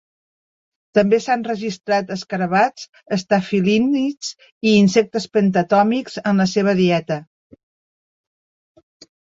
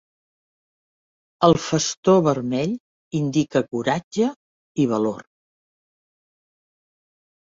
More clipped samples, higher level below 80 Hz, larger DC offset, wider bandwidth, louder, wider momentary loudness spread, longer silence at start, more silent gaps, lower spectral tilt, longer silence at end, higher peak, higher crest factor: neither; about the same, -58 dBFS vs -58 dBFS; neither; about the same, 7.8 kHz vs 7.8 kHz; first, -18 LUFS vs -21 LUFS; about the same, 9 LU vs 10 LU; second, 0.95 s vs 1.4 s; second, 2.89-2.93 s, 4.52-4.61 s vs 1.97-2.03 s, 2.80-3.11 s, 4.04-4.11 s, 4.36-4.75 s; about the same, -6 dB/octave vs -5.5 dB/octave; second, 1.95 s vs 2.25 s; about the same, -2 dBFS vs -2 dBFS; about the same, 18 dB vs 22 dB